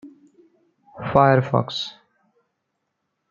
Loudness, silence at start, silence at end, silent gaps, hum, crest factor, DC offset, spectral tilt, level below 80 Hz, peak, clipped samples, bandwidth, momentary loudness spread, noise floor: -20 LUFS; 0.05 s; 1.4 s; none; none; 22 dB; under 0.1%; -7 dB/octave; -56 dBFS; -2 dBFS; under 0.1%; 7.4 kHz; 16 LU; -77 dBFS